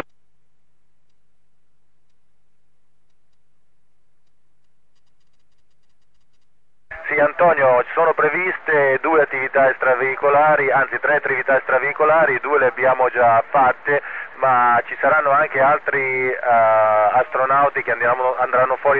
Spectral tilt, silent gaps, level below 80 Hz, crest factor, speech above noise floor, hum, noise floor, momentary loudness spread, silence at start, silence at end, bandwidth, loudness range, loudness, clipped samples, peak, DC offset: -8.5 dB/octave; none; -62 dBFS; 14 dB; 56 dB; none; -73 dBFS; 4 LU; 6.9 s; 0 s; 4.3 kHz; 3 LU; -16 LUFS; under 0.1%; -6 dBFS; 0.6%